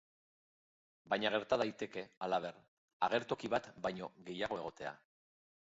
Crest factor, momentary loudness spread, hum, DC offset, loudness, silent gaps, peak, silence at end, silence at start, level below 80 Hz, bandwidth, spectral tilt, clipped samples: 22 dB; 12 LU; none; under 0.1%; -39 LUFS; 2.17-2.21 s, 2.68-3.00 s; -18 dBFS; 0.8 s; 1.05 s; -74 dBFS; 7.6 kHz; -2.5 dB/octave; under 0.1%